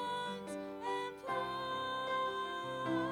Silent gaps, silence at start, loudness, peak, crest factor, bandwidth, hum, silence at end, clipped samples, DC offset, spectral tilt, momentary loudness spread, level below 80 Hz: none; 0 s; -39 LUFS; -24 dBFS; 14 dB; 18 kHz; none; 0 s; under 0.1%; under 0.1%; -4.5 dB/octave; 5 LU; -72 dBFS